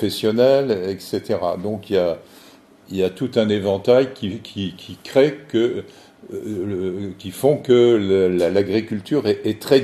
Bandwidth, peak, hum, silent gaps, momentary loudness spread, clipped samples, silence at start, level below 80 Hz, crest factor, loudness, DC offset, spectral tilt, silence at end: 13.5 kHz; -2 dBFS; none; none; 13 LU; under 0.1%; 0 s; -60 dBFS; 18 dB; -20 LUFS; under 0.1%; -6.5 dB/octave; 0 s